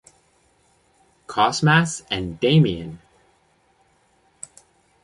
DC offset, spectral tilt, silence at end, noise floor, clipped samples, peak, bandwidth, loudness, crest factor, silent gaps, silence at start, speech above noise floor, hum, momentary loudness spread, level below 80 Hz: under 0.1%; -5 dB/octave; 2.1 s; -62 dBFS; under 0.1%; -2 dBFS; 11 kHz; -20 LUFS; 22 dB; none; 1.3 s; 42 dB; none; 23 LU; -52 dBFS